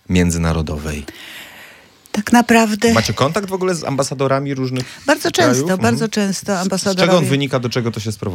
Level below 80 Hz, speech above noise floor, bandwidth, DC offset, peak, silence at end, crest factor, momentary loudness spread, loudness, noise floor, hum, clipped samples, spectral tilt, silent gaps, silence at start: -40 dBFS; 28 dB; 17 kHz; under 0.1%; 0 dBFS; 0 s; 16 dB; 12 LU; -17 LUFS; -44 dBFS; none; under 0.1%; -5 dB/octave; none; 0.1 s